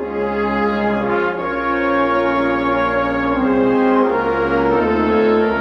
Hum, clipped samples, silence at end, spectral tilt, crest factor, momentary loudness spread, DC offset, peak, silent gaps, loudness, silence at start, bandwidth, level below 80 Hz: none; under 0.1%; 0 s; -8 dB/octave; 12 dB; 4 LU; under 0.1%; -4 dBFS; none; -17 LUFS; 0 s; 6.4 kHz; -40 dBFS